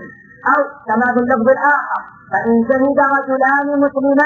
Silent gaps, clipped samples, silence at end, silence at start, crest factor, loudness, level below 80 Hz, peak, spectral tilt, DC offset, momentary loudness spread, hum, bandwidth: none; under 0.1%; 0 s; 0 s; 14 dB; -15 LUFS; -54 dBFS; 0 dBFS; -8.5 dB/octave; under 0.1%; 7 LU; none; 6.8 kHz